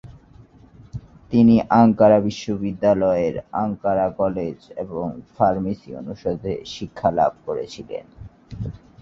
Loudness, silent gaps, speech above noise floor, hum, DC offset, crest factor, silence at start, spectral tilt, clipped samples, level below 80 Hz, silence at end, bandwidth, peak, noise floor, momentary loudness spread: -20 LUFS; none; 28 dB; none; under 0.1%; 18 dB; 0.05 s; -8 dB/octave; under 0.1%; -48 dBFS; 0.25 s; 7.2 kHz; -2 dBFS; -48 dBFS; 19 LU